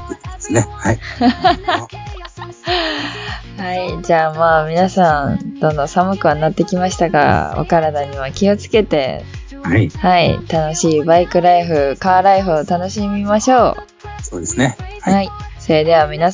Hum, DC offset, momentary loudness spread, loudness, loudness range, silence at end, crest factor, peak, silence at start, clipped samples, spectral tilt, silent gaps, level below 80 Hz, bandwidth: none; under 0.1%; 14 LU; -15 LUFS; 5 LU; 0 s; 14 dB; 0 dBFS; 0 s; under 0.1%; -5.5 dB/octave; none; -34 dBFS; 7.6 kHz